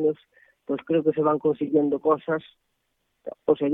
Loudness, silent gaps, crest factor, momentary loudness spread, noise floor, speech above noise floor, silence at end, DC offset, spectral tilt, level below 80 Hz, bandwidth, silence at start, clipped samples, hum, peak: -24 LUFS; none; 18 dB; 16 LU; -75 dBFS; 51 dB; 0 s; under 0.1%; -10 dB/octave; -68 dBFS; 3.9 kHz; 0 s; under 0.1%; none; -8 dBFS